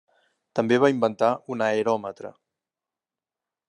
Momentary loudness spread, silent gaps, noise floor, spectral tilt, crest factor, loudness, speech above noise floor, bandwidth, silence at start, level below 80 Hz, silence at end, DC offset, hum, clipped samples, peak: 16 LU; none; under -90 dBFS; -6 dB/octave; 20 dB; -23 LUFS; over 67 dB; 10 kHz; 0.55 s; -76 dBFS; 1.4 s; under 0.1%; none; under 0.1%; -6 dBFS